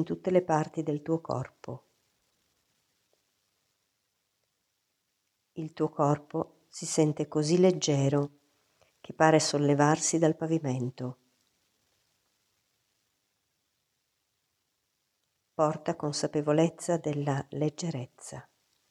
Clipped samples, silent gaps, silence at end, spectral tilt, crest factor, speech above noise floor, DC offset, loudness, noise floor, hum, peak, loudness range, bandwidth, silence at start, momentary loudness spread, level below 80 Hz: under 0.1%; none; 0.5 s; -5.5 dB/octave; 24 dB; 51 dB; under 0.1%; -28 LUFS; -79 dBFS; none; -6 dBFS; 13 LU; 12.5 kHz; 0 s; 17 LU; -74 dBFS